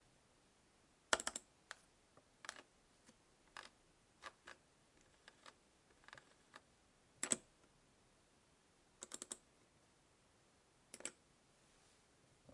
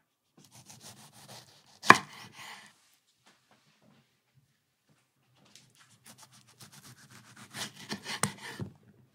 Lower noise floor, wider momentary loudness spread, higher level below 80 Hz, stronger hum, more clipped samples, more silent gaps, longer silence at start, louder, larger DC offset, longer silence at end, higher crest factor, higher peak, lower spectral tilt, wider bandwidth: about the same, -74 dBFS vs -74 dBFS; second, 24 LU vs 31 LU; about the same, -82 dBFS vs -80 dBFS; neither; neither; neither; first, 1.1 s vs 0.85 s; second, -47 LUFS vs -28 LUFS; neither; second, 0 s vs 0.45 s; about the same, 40 dB vs 36 dB; second, -16 dBFS vs 0 dBFS; second, -0.5 dB/octave vs -2.5 dB/octave; second, 12 kHz vs 16 kHz